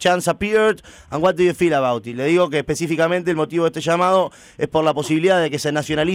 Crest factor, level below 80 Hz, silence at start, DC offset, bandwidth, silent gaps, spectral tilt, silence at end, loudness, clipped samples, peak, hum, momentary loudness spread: 12 dB; -50 dBFS; 0 s; under 0.1%; 16 kHz; none; -5 dB/octave; 0 s; -19 LUFS; under 0.1%; -6 dBFS; none; 6 LU